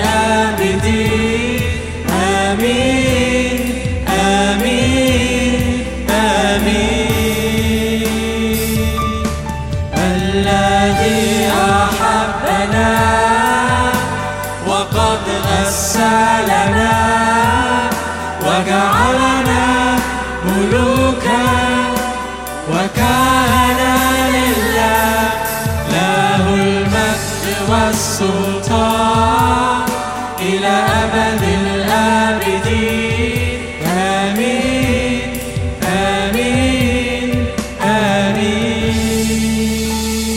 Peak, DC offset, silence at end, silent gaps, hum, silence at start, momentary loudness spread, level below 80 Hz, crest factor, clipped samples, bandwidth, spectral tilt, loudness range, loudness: 0 dBFS; under 0.1%; 0 s; none; none; 0 s; 6 LU; -30 dBFS; 14 dB; under 0.1%; 17 kHz; -4.5 dB/octave; 3 LU; -14 LUFS